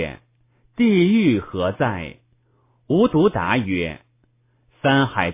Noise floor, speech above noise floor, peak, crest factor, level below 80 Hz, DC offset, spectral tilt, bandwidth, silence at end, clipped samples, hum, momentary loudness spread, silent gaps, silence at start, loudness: -62 dBFS; 44 dB; -2 dBFS; 18 dB; -46 dBFS; under 0.1%; -11 dB/octave; 3.8 kHz; 0 s; under 0.1%; none; 14 LU; none; 0 s; -19 LUFS